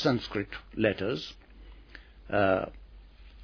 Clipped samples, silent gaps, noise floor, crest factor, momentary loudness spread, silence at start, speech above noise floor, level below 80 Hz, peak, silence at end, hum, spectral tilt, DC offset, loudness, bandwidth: under 0.1%; none; -51 dBFS; 20 dB; 24 LU; 0 s; 22 dB; -52 dBFS; -12 dBFS; 0 s; none; -6.5 dB/octave; under 0.1%; -30 LUFS; 5.4 kHz